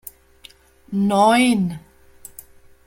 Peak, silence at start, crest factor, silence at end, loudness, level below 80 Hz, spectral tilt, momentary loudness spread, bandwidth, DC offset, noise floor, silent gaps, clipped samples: -4 dBFS; 0.9 s; 18 dB; 1.1 s; -18 LUFS; -54 dBFS; -5 dB/octave; 25 LU; 16.5 kHz; under 0.1%; -49 dBFS; none; under 0.1%